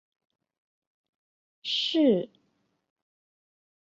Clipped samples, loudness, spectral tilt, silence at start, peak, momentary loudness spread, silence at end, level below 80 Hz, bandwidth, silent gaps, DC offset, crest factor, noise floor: under 0.1%; -25 LUFS; -5.5 dB/octave; 1.65 s; -12 dBFS; 16 LU; 1.6 s; -80 dBFS; 7.8 kHz; none; under 0.1%; 20 dB; -74 dBFS